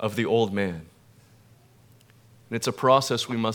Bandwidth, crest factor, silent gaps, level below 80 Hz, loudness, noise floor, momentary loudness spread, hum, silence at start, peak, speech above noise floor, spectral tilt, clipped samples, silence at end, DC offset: 19.5 kHz; 22 dB; none; -64 dBFS; -24 LUFS; -56 dBFS; 12 LU; none; 0 s; -6 dBFS; 32 dB; -5 dB/octave; under 0.1%; 0 s; under 0.1%